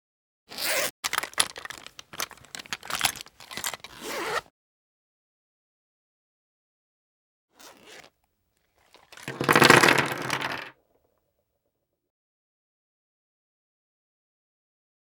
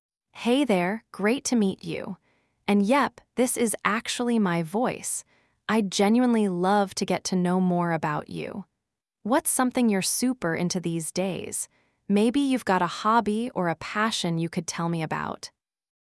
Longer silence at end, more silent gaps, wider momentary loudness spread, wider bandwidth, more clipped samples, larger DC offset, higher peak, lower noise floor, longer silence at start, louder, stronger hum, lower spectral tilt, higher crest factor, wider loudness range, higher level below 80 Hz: first, 4.45 s vs 0.6 s; first, 0.90-1.03 s, 4.50-7.48 s vs none; first, 24 LU vs 11 LU; first, over 20 kHz vs 12 kHz; neither; neither; first, 0 dBFS vs -6 dBFS; second, -79 dBFS vs -84 dBFS; first, 0.5 s vs 0.35 s; about the same, -24 LUFS vs -25 LUFS; neither; second, -2.5 dB/octave vs -4.5 dB/octave; first, 30 dB vs 20 dB; first, 16 LU vs 2 LU; about the same, -66 dBFS vs -64 dBFS